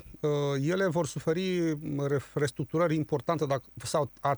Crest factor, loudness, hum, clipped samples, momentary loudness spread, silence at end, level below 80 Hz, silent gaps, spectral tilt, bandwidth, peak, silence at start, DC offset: 14 dB; -30 LUFS; none; under 0.1%; 4 LU; 0 s; -60 dBFS; none; -6 dB/octave; over 20 kHz; -16 dBFS; 0.05 s; under 0.1%